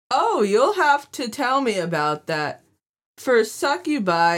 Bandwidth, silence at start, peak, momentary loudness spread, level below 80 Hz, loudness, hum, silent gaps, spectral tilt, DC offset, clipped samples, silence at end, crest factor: 17 kHz; 0.1 s; -6 dBFS; 8 LU; -72 dBFS; -21 LUFS; none; 2.89-2.94 s, 3.06-3.14 s; -4 dB/octave; under 0.1%; under 0.1%; 0 s; 16 dB